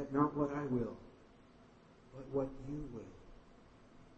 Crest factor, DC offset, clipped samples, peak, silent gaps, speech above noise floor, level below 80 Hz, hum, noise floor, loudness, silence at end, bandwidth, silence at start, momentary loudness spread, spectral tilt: 22 dB; under 0.1%; under 0.1%; -20 dBFS; none; 24 dB; -60 dBFS; none; -62 dBFS; -39 LUFS; 0 s; 7.8 kHz; 0 s; 24 LU; -9 dB/octave